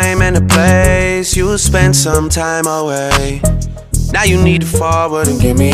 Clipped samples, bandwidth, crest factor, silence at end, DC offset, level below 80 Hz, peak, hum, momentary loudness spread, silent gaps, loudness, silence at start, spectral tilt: under 0.1%; 16 kHz; 12 dB; 0 s; under 0.1%; -20 dBFS; 0 dBFS; none; 6 LU; none; -12 LUFS; 0 s; -4.5 dB/octave